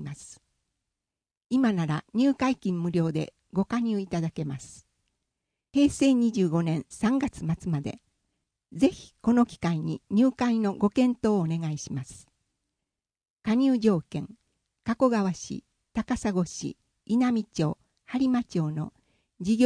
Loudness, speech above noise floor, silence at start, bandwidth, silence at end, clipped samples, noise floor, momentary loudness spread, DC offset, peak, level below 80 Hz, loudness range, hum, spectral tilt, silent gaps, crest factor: -27 LUFS; over 64 dB; 0 s; 10.5 kHz; 0 s; under 0.1%; under -90 dBFS; 14 LU; under 0.1%; -8 dBFS; -56 dBFS; 4 LU; none; -6.5 dB/octave; 13.30-13.34 s; 18 dB